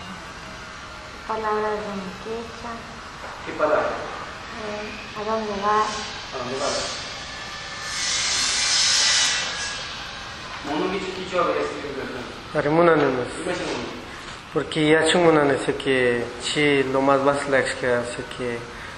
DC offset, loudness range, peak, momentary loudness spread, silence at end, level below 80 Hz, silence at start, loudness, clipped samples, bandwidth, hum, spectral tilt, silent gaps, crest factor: under 0.1%; 8 LU; -2 dBFS; 17 LU; 0 s; -50 dBFS; 0 s; -22 LUFS; under 0.1%; 12.5 kHz; none; -3 dB/octave; none; 22 dB